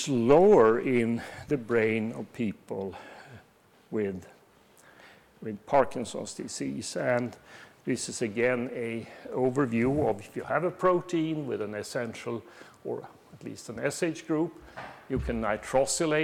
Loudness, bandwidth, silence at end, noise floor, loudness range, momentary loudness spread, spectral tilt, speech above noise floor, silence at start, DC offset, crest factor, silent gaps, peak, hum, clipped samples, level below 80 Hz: -29 LUFS; 15.5 kHz; 0 s; -61 dBFS; 6 LU; 14 LU; -5.5 dB/octave; 32 dB; 0 s; under 0.1%; 22 dB; none; -6 dBFS; none; under 0.1%; -54 dBFS